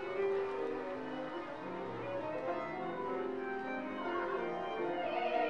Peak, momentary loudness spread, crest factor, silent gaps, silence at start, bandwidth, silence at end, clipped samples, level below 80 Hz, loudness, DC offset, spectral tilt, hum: -24 dBFS; 6 LU; 16 dB; none; 0 s; 7.6 kHz; 0 s; under 0.1%; -72 dBFS; -39 LUFS; 0.1%; -6.5 dB/octave; none